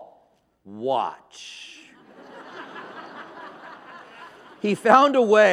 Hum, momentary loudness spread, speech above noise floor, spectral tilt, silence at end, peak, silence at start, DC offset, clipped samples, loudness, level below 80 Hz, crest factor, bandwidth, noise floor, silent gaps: none; 27 LU; 42 dB; -4.5 dB/octave; 0 s; -2 dBFS; 0 s; under 0.1%; under 0.1%; -20 LUFS; -76 dBFS; 22 dB; 12.5 kHz; -62 dBFS; none